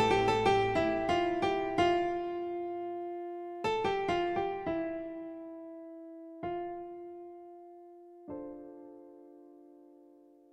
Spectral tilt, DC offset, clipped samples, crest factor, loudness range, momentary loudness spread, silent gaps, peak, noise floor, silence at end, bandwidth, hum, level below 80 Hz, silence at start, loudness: -5.5 dB/octave; under 0.1%; under 0.1%; 20 dB; 17 LU; 23 LU; none; -16 dBFS; -59 dBFS; 0.6 s; 10.5 kHz; none; -60 dBFS; 0 s; -33 LUFS